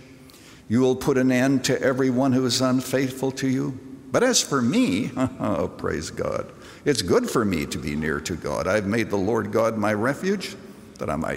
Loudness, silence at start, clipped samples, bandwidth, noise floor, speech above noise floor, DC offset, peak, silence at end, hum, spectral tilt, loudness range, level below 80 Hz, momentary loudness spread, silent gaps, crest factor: -23 LUFS; 0 s; under 0.1%; 16 kHz; -47 dBFS; 24 dB; under 0.1%; -6 dBFS; 0 s; none; -4.5 dB/octave; 3 LU; -52 dBFS; 9 LU; none; 18 dB